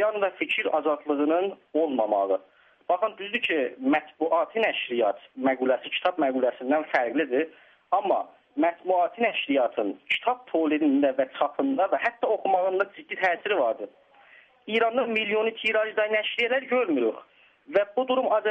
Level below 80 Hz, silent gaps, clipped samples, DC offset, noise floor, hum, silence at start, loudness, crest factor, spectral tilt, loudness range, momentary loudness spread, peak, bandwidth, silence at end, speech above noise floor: -76 dBFS; none; under 0.1%; under 0.1%; -55 dBFS; none; 0 s; -26 LUFS; 16 dB; -5.5 dB/octave; 1 LU; 5 LU; -10 dBFS; 7.8 kHz; 0 s; 30 dB